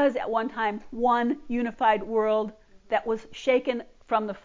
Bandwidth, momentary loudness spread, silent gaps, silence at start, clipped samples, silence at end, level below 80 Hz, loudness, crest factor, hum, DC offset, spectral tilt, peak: 7.6 kHz; 6 LU; none; 0 s; under 0.1%; 0.05 s; -58 dBFS; -27 LUFS; 16 dB; none; under 0.1%; -5.5 dB/octave; -10 dBFS